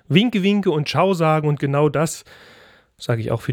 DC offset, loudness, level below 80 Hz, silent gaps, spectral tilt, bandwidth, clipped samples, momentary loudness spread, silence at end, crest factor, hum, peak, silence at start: under 0.1%; -19 LUFS; -56 dBFS; none; -6 dB/octave; 16.5 kHz; under 0.1%; 8 LU; 0 s; 18 dB; none; -2 dBFS; 0.1 s